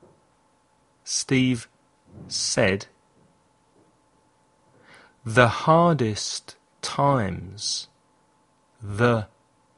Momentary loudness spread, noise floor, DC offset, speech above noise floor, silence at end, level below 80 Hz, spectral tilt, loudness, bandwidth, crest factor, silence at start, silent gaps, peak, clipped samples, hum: 20 LU; -64 dBFS; under 0.1%; 41 dB; 0.5 s; -56 dBFS; -4.5 dB/octave; -23 LUFS; 11.5 kHz; 26 dB; 1.05 s; none; 0 dBFS; under 0.1%; none